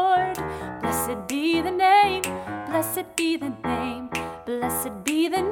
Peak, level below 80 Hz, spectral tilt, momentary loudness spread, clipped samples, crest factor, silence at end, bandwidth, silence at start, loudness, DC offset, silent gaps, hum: -2 dBFS; -52 dBFS; -3.5 dB/octave; 12 LU; under 0.1%; 22 dB; 0 s; 19 kHz; 0 s; -24 LUFS; under 0.1%; none; none